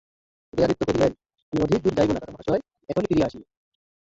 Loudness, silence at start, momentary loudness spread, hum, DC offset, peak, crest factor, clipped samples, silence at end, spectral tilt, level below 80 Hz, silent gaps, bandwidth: -24 LUFS; 0.55 s; 7 LU; none; under 0.1%; -8 dBFS; 18 dB; under 0.1%; 0.75 s; -7 dB/octave; -48 dBFS; 1.42-1.52 s; 8 kHz